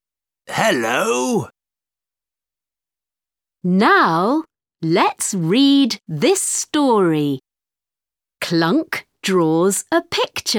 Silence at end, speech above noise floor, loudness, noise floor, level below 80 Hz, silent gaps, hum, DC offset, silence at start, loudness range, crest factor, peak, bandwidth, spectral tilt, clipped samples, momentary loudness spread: 0 s; over 73 dB; -17 LUFS; under -90 dBFS; -64 dBFS; none; none; under 0.1%; 0.5 s; 6 LU; 18 dB; 0 dBFS; 18.5 kHz; -4 dB/octave; under 0.1%; 10 LU